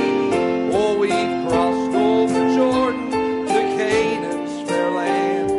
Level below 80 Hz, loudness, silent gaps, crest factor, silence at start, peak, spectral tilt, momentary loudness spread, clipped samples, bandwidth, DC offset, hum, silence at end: -52 dBFS; -19 LUFS; none; 12 dB; 0 s; -6 dBFS; -5 dB/octave; 5 LU; under 0.1%; 11.5 kHz; under 0.1%; none; 0 s